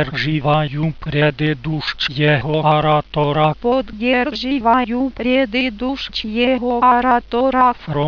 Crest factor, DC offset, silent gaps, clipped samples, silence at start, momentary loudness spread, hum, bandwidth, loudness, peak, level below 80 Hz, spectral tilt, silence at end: 16 dB; under 0.1%; none; under 0.1%; 0 s; 6 LU; none; 5.4 kHz; -17 LUFS; -2 dBFS; -40 dBFS; -7.5 dB/octave; 0 s